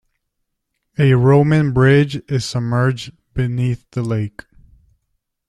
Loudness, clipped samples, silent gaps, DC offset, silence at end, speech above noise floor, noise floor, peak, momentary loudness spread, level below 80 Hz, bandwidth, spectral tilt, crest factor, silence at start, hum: -16 LUFS; under 0.1%; none; under 0.1%; 1.2 s; 58 dB; -74 dBFS; -2 dBFS; 13 LU; -44 dBFS; 11 kHz; -7.5 dB/octave; 16 dB; 1 s; none